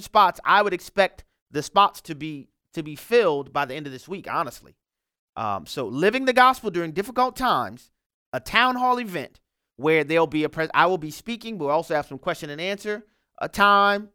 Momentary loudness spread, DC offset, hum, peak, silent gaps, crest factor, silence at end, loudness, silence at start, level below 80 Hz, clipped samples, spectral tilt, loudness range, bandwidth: 16 LU; under 0.1%; none; -2 dBFS; 1.42-1.46 s, 5.19-5.33 s, 8.06-8.32 s; 22 dB; 0.1 s; -22 LUFS; 0 s; -56 dBFS; under 0.1%; -4.5 dB/octave; 5 LU; 18 kHz